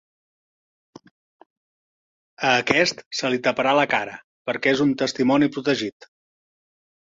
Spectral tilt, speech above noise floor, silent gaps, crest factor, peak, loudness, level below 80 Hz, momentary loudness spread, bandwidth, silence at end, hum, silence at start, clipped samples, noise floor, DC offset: -4 dB/octave; over 69 dB; 3.06-3.11 s, 4.24-4.45 s; 24 dB; 0 dBFS; -21 LUFS; -64 dBFS; 9 LU; 7.8 kHz; 1.1 s; none; 2.4 s; under 0.1%; under -90 dBFS; under 0.1%